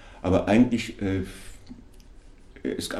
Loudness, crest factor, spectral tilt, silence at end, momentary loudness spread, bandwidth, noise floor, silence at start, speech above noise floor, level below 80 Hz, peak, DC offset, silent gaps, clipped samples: -25 LUFS; 18 dB; -6 dB/octave; 0 s; 19 LU; 13.5 kHz; -48 dBFS; 0 s; 24 dB; -46 dBFS; -8 dBFS; under 0.1%; none; under 0.1%